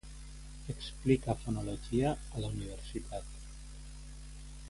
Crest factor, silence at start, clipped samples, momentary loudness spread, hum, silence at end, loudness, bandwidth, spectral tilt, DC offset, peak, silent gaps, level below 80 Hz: 24 dB; 0.05 s; under 0.1%; 19 LU; none; 0 s; -36 LUFS; 11.5 kHz; -6.5 dB/octave; under 0.1%; -14 dBFS; none; -46 dBFS